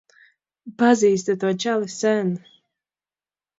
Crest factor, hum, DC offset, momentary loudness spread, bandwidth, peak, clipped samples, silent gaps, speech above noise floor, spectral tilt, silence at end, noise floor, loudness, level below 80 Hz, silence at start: 18 dB; none; under 0.1%; 8 LU; 8 kHz; -4 dBFS; under 0.1%; none; over 70 dB; -5 dB/octave; 1.2 s; under -90 dBFS; -21 LUFS; -72 dBFS; 0.65 s